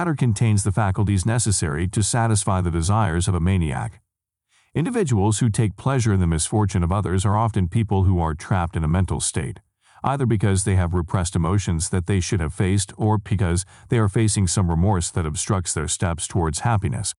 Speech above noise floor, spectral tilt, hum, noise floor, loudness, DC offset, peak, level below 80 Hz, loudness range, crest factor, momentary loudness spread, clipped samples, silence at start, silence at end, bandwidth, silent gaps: 53 dB; -5.5 dB/octave; none; -73 dBFS; -21 LUFS; under 0.1%; -8 dBFS; -36 dBFS; 2 LU; 14 dB; 4 LU; under 0.1%; 0 s; 0.05 s; 12 kHz; none